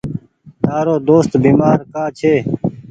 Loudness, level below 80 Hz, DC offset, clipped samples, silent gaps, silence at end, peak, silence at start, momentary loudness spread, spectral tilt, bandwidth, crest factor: -14 LUFS; -46 dBFS; under 0.1%; under 0.1%; none; 0.1 s; 0 dBFS; 0.05 s; 11 LU; -8.5 dB/octave; 9 kHz; 14 dB